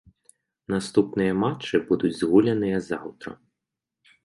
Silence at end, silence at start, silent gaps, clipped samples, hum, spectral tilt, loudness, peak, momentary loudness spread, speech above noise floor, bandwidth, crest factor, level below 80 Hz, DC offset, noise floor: 0.9 s; 0.7 s; none; under 0.1%; none; -6.5 dB/octave; -24 LUFS; -6 dBFS; 14 LU; 62 dB; 11.5 kHz; 20 dB; -58 dBFS; under 0.1%; -85 dBFS